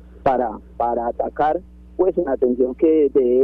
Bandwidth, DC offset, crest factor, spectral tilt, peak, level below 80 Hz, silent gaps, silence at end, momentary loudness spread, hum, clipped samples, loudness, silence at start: 4.5 kHz; under 0.1%; 16 dB; -9.5 dB/octave; -4 dBFS; -44 dBFS; none; 0 s; 8 LU; none; under 0.1%; -20 LUFS; 0.15 s